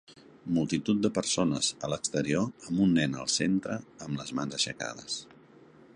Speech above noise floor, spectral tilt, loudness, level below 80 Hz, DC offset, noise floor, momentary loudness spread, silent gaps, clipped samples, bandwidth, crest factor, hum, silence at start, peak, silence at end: 26 dB; -4 dB/octave; -30 LUFS; -60 dBFS; under 0.1%; -55 dBFS; 11 LU; none; under 0.1%; 11.5 kHz; 20 dB; none; 0.1 s; -12 dBFS; 0.3 s